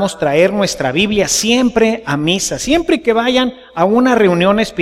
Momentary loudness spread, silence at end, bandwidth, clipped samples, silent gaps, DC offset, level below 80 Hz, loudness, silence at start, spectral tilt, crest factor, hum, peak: 5 LU; 0 s; 16 kHz; under 0.1%; none; under 0.1%; -40 dBFS; -13 LUFS; 0 s; -4 dB/octave; 12 dB; none; 0 dBFS